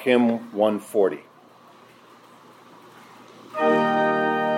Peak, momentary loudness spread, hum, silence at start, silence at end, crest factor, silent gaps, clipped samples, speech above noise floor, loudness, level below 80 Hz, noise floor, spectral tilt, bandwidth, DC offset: -6 dBFS; 5 LU; none; 0 s; 0 s; 18 dB; none; under 0.1%; 29 dB; -22 LUFS; -80 dBFS; -51 dBFS; -6 dB/octave; 16 kHz; under 0.1%